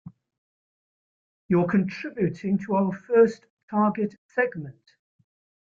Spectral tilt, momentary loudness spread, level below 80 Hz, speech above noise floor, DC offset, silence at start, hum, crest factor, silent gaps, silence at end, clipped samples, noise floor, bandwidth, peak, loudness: -9 dB/octave; 10 LU; -66 dBFS; over 66 dB; under 0.1%; 0.05 s; none; 18 dB; 0.38-1.49 s, 3.50-3.57 s, 3.63-3.68 s, 4.18-4.29 s; 0.9 s; under 0.1%; under -90 dBFS; 7.4 kHz; -8 dBFS; -25 LUFS